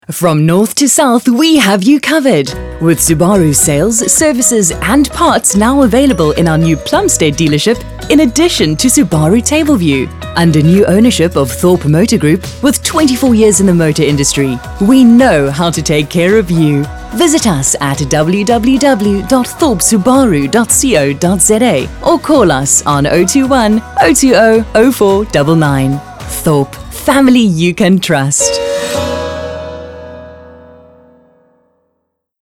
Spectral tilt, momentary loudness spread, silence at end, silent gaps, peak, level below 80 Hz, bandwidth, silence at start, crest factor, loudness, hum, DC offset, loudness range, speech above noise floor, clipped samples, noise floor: -4.5 dB/octave; 7 LU; 1.95 s; none; 0 dBFS; -30 dBFS; 17.5 kHz; 0.1 s; 10 dB; -9 LUFS; none; under 0.1%; 2 LU; 58 dB; 0.5%; -67 dBFS